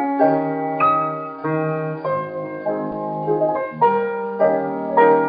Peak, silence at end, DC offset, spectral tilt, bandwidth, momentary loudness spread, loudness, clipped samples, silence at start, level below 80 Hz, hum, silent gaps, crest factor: -2 dBFS; 0 s; under 0.1%; -6.5 dB/octave; 5 kHz; 8 LU; -20 LUFS; under 0.1%; 0 s; -64 dBFS; none; none; 18 dB